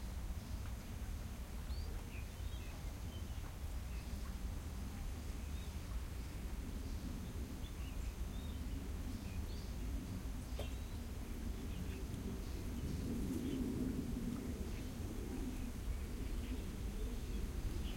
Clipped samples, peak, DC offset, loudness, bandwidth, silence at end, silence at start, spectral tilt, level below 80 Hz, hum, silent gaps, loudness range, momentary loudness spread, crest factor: under 0.1%; -28 dBFS; under 0.1%; -46 LUFS; 16.5 kHz; 0 s; 0 s; -6 dB/octave; -46 dBFS; none; none; 4 LU; 5 LU; 14 dB